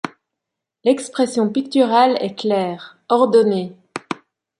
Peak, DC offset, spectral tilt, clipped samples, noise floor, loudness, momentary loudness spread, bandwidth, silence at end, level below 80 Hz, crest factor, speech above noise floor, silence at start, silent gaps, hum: -2 dBFS; under 0.1%; -5.5 dB/octave; under 0.1%; -82 dBFS; -18 LUFS; 17 LU; 11.5 kHz; 0.45 s; -70 dBFS; 18 dB; 65 dB; 0.05 s; none; none